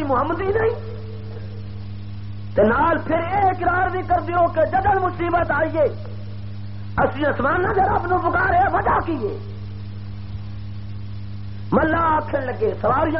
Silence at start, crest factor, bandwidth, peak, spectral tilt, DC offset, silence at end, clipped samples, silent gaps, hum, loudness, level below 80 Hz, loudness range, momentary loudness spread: 0 s; 16 dB; 5.8 kHz; -6 dBFS; -6 dB/octave; 2%; 0 s; under 0.1%; none; none; -20 LUFS; -38 dBFS; 5 LU; 15 LU